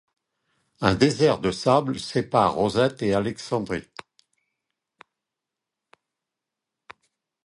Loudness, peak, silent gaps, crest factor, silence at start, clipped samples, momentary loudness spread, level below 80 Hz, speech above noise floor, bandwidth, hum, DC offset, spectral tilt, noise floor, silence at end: -23 LUFS; -2 dBFS; none; 24 dB; 0.8 s; under 0.1%; 10 LU; -52 dBFS; 64 dB; 11.5 kHz; none; under 0.1%; -5.5 dB/octave; -86 dBFS; 3.65 s